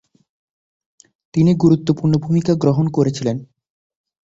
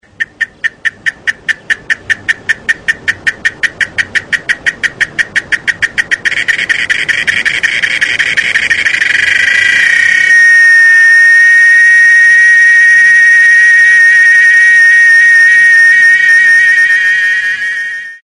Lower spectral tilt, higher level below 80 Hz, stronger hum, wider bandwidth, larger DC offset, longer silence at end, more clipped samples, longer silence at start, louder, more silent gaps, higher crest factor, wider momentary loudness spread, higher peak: first, -8 dB/octave vs 0.5 dB/octave; about the same, -52 dBFS vs -48 dBFS; neither; second, 7.8 kHz vs 11.5 kHz; neither; first, 0.9 s vs 0.1 s; neither; first, 1.35 s vs 0.2 s; second, -17 LUFS vs -5 LUFS; neither; first, 16 dB vs 8 dB; about the same, 9 LU vs 11 LU; about the same, -2 dBFS vs 0 dBFS